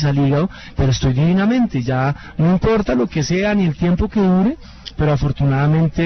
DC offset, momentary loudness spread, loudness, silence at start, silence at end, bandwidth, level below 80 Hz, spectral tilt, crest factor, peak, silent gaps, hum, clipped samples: under 0.1%; 5 LU; -17 LUFS; 0 s; 0 s; 6.4 kHz; -32 dBFS; -7.5 dB/octave; 12 dB; -4 dBFS; none; none; under 0.1%